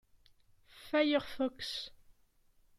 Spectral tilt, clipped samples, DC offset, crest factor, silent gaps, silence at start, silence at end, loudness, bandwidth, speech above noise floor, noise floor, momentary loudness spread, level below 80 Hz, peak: -3.5 dB/octave; under 0.1%; under 0.1%; 20 dB; none; 0.75 s; 0.7 s; -34 LUFS; 14.5 kHz; 35 dB; -69 dBFS; 12 LU; -66 dBFS; -18 dBFS